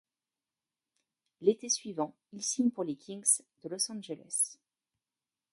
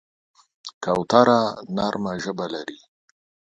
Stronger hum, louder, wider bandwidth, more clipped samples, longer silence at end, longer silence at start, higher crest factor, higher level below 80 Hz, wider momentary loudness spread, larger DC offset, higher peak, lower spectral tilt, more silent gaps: neither; second, -32 LUFS vs -22 LUFS; first, 12 kHz vs 9.6 kHz; neither; first, 1 s vs 0.85 s; first, 1.4 s vs 0.65 s; about the same, 24 dB vs 24 dB; second, -84 dBFS vs -60 dBFS; second, 10 LU vs 20 LU; neither; second, -12 dBFS vs 0 dBFS; second, -3 dB/octave vs -5.5 dB/octave; second, none vs 0.74-0.81 s